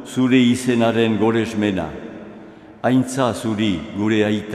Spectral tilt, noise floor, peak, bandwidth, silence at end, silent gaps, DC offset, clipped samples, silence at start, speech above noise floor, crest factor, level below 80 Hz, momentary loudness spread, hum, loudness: -6 dB/octave; -40 dBFS; -4 dBFS; 13.5 kHz; 0 s; none; under 0.1%; under 0.1%; 0 s; 22 dB; 16 dB; -54 dBFS; 15 LU; none; -19 LUFS